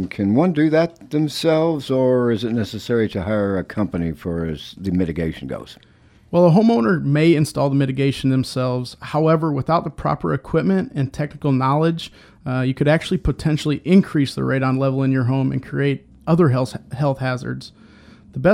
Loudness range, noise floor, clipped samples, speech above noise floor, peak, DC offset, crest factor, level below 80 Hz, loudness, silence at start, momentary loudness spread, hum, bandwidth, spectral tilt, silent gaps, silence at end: 4 LU; -46 dBFS; under 0.1%; 27 dB; -2 dBFS; under 0.1%; 16 dB; -42 dBFS; -19 LUFS; 0 s; 10 LU; none; 14.5 kHz; -7.5 dB/octave; none; 0 s